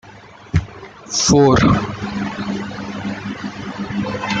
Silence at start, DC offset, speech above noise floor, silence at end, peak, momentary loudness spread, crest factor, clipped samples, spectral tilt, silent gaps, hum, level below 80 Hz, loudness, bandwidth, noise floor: 0.05 s; under 0.1%; 23 dB; 0 s; -2 dBFS; 16 LU; 18 dB; under 0.1%; -5 dB/octave; none; none; -38 dBFS; -19 LUFS; 9.4 kHz; -41 dBFS